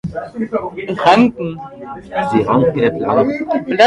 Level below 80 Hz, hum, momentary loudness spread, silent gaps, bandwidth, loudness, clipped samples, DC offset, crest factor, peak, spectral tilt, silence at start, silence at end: -46 dBFS; none; 14 LU; none; 10.5 kHz; -16 LUFS; under 0.1%; under 0.1%; 16 dB; 0 dBFS; -6.5 dB/octave; 0.05 s; 0 s